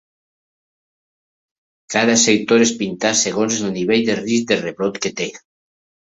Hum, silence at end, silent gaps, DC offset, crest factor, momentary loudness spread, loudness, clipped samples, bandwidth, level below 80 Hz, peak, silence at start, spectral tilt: none; 0.75 s; none; under 0.1%; 18 dB; 9 LU; -17 LUFS; under 0.1%; 8 kHz; -60 dBFS; -2 dBFS; 1.9 s; -3 dB/octave